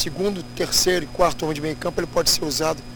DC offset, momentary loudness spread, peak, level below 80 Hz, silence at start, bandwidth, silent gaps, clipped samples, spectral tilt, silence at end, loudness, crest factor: under 0.1%; 8 LU; -2 dBFS; -38 dBFS; 0 s; over 20 kHz; none; under 0.1%; -3 dB/octave; 0 s; -21 LUFS; 20 dB